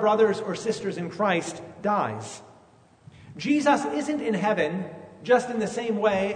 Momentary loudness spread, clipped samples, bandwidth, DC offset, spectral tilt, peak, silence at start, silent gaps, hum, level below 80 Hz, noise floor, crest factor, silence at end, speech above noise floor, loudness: 15 LU; under 0.1%; 9.6 kHz; under 0.1%; -5 dB/octave; -8 dBFS; 0 s; none; none; -66 dBFS; -56 dBFS; 18 dB; 0 s; 31 dB; -25 LUFS